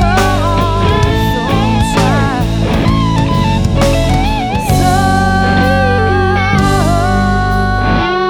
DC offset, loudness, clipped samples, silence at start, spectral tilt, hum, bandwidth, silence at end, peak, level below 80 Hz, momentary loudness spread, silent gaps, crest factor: under 0.1%; -12 LUFS; under 0.1%; 0 s; -6 dB/octave; none; 18 kHz; 0 s; 0 dBFS; -20 dBFS; 3 LU; none; 10 dB